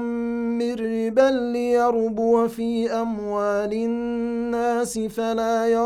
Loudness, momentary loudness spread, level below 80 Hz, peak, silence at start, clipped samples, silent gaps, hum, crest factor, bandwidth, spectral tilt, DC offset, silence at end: -23 LUFS; 6 LU; -56 dBFS; -4 dBFS; 0 s; under 0.1%; none; none; 18 dB; 14.5 kHz; -5.5 dB/octave; under 0.1%; 0 s